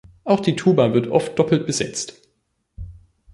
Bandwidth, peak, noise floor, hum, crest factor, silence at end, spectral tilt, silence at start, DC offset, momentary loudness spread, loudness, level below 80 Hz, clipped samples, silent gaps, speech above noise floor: 11.5 kHz; -2 dBFS; -70 dBFS; none; 18 dB; 0.4 s; -5.5 dB/octave; 0.25 s; under 0.1%; 22 LU; -19 LUFS; -48 dBFS; under 0.1%; none; 51 dB